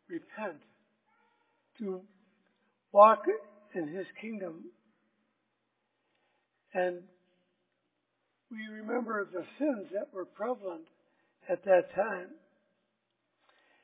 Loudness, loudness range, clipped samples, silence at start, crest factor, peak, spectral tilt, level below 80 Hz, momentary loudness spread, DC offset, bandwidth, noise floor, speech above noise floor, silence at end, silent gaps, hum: -31 LUFS; 13 LU; under 0.1%; 0.1 s; 26 dB; -8 dBFS; -4.5 dB/octave; -88 dBFS; 19 LU; under 0.1%; 4 kHz; -81 dBFS; 50 dB; 1.5 s; none; none